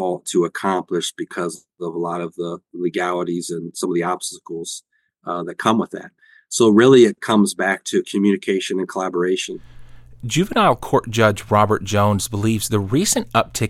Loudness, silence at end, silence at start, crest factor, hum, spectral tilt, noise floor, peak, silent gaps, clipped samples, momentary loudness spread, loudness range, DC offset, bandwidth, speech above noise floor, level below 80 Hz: -19 LUFS; 0 s; 0 s; 18 dB; none; -5 dB/octave; -39 dBFS; -2 dBFS; none; under 0.1%; 13 LU; 8 LU; under 0.1%; 16.5 kHz; 20 dB; -50 dBFS